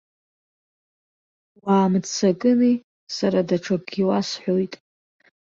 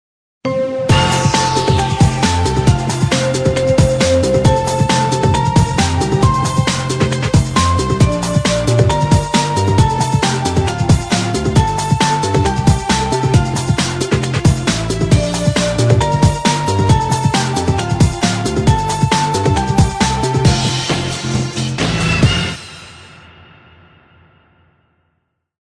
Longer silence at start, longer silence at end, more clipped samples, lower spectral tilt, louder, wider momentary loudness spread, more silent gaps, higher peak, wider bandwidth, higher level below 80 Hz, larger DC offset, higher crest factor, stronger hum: first, 1.65 s vs 0.45 s; second, 0.85 s vs 2.55 s; neither; about the same, -6 dB/octave vs -5 dB/octave; second, -22 LUFS vs -14 LUFS; first, 11 LU vs 4 LU; first, 2.84-3.07 s vs none; second, -8 dBFS vs 0 dBFS; second, 7.6 kHz vs 11 kHz; second, -64 dBFS vs -28 dBFS; neither; about the same, 16 dB vs 14 dB; neither